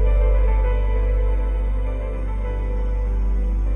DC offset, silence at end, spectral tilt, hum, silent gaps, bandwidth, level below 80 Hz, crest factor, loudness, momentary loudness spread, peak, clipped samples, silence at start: under 0.1%; 0 s; -9 dB/octave; none; none; 3.2 kHz; -18 dBFS; 10 dB; -23 LUFS; 7 LU; -10 dBFS; under 0.1%; 0 s